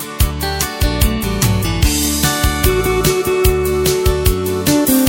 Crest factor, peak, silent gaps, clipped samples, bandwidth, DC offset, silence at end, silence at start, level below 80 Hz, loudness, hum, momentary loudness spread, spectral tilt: 14 dB; 0 dBFS; none; under 0.1%; 17 kHz; under 0.1%; 0 s; 0 s; -20 dBFS; -15 LUFS; none; 3 LU; -4.5 dB/octave